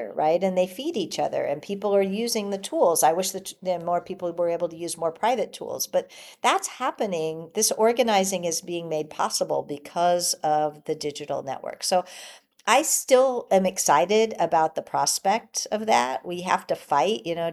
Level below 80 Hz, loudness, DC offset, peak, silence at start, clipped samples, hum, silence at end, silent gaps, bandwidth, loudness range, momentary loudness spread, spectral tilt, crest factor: -72 dBFS; -24 LUFS; under 0.1%; -6 dBFS; 0 s; under 0.1%; none; 0 s; none; 14.5 kHz; 5 LU; 10 LU; -3 dB/octave; 20 dB